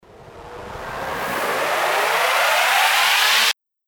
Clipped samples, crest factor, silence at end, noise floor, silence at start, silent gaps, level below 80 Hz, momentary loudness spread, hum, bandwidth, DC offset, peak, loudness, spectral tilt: under 0.1%; 16 dB; 0.35 s; -41 dBFS; 0.15 s; none; -52 dBFS; 18 LU; none; over 20 kHz; under 0.1%; -4 dBFS; -17 LUFS; 0 dB/octave